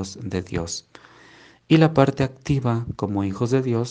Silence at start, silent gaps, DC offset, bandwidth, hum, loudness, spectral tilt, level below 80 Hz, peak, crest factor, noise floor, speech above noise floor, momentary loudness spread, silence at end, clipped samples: 0 s; none; under 0.1%; 9.8 kHz; none; -22 LUFS; -6.5 dB/octave; -50 dBFS; 0 dBFS; 22 dB; -50 dBFS; 29 dB; 12 LU; 0 s; under 0.1%